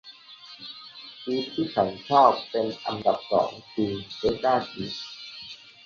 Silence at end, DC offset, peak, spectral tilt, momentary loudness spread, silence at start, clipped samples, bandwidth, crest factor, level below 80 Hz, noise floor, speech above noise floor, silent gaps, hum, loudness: 0.3 s; under 0.1%; -4 dBFS; -6 dB/octave; 20 LU; 0.05 s; under 0.1%; 7.2 kHz; 22 dB; -58 dBFS; -47 dBFS; 22 dB; none; none; -25 LUFS